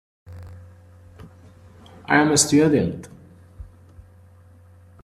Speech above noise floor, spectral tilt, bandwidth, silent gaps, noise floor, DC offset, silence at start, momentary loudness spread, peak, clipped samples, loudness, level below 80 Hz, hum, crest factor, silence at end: 31 dB; -4 dB/octave; 14 kHz; none; -49 dBFS; under 0.1%; 0.3 s; 27 LU; -2 dBFS; under 0.1%; -18 LUFS; -54 dBFS; none; 24 dB; 1.35 s